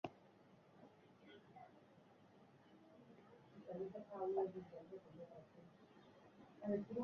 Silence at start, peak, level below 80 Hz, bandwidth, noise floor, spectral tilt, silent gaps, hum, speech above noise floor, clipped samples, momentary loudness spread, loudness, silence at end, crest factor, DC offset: 0.05 s; -30 dBFS; -86 dBFS; 6.8 kHz; -68 dBFS; -7 dB/octave; none; none; 21 dB; under 0.1%; 24 LU; -49 LUFS; 0 s; 22 dB; under 0.1%